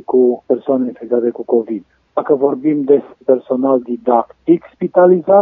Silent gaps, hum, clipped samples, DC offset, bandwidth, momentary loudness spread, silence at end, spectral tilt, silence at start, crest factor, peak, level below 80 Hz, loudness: none; none; under 0.1%; under 0.1%; 3.8 kHz; 7 LU; 0 s; -11.5 dB/octave; 0.1 s; 14 dB; 0 dBFS; -66 dBFS; -15 LUFS